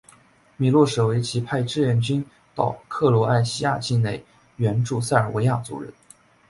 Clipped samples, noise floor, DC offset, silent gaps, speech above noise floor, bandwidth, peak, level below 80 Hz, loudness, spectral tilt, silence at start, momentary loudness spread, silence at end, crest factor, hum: under 0.1%; -55 dBFS; under 0.1%; none; 33 dB; 11.5 kHz; -4 dBFS; -54 dBFS; -22 LUFS; -6.5 dB/octave; 0.6 s; 9 LU; 0.6 s; 20 dB; none